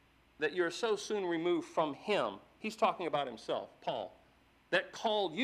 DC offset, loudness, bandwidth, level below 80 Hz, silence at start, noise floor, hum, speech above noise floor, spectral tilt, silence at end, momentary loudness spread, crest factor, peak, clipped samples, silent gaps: under 0.1%; -35 LUFS; 13 kHz; -76 dBFS; 0.4 s; -67 dBFS; none; 32 dB; -4 dB/octave; 0 s; 7 LU; 22 dB; -14 dBFS; under 0.1%; none